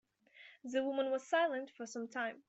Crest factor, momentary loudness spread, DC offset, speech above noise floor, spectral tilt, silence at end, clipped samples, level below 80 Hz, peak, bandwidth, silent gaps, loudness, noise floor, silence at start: 18 dB; 13 LU; under 0.1%; 25 dB; -3 dB/octave; 0.1 s; under 0.1%; -88 dBFS; -20 dBFS; 8.2 kHz; none; -37 LUFS; -62 dBFS; 0.35 s